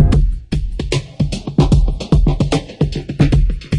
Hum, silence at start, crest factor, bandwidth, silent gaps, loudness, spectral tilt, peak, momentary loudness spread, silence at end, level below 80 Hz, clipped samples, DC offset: none; 0 s; 14 dB; 11 kHz; none; -17 LUFS; -7 dB/octave; 0 dBFS; 7 LU; 0 s; -18 dBFS; under 0.1%; under 0.1%